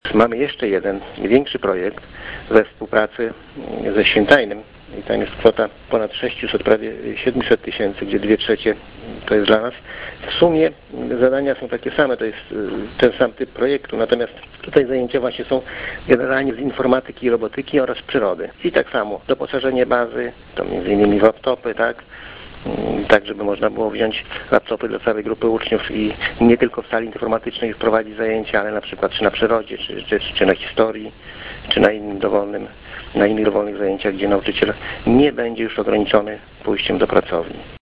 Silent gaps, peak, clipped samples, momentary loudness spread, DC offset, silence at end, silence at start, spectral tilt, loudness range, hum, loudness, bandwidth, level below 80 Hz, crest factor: none; 0 dBFS; under 0.1%; 12 LU; under 0.1%; 0.2 s; 0.05 s; -7 dB/octave; 2 LU; none; -19 LUFS; 6.8 kHz; -44 dBFS; 18 dB